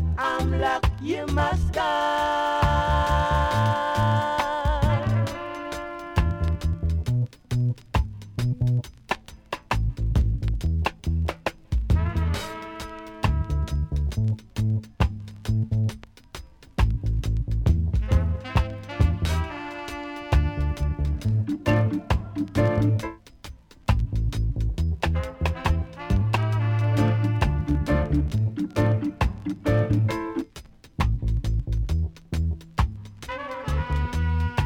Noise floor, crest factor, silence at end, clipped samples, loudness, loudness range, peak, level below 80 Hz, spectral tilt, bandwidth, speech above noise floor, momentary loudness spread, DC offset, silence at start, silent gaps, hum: -46 dBFS; 18 dB; 0 s; under 0.1%; -25 LUFS; 4 LU; -6 dBFS; -30 dBFS; -7 dB/octave; 14.5 kHz; 22 dB; 11 LU; under 0.1%; 0 s; none; none